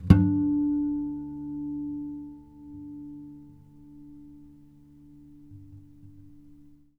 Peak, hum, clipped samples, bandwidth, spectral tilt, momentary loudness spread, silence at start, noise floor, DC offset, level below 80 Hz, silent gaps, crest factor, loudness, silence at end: -2 dBFS; none; under 0.1%; 5.2 kHz; -10 dB/octave; 27 LU; 0 s; -53 dBFS; under 0.1%; -44 dBFS; none; 28 dB; -28 LUFS; 0.35 s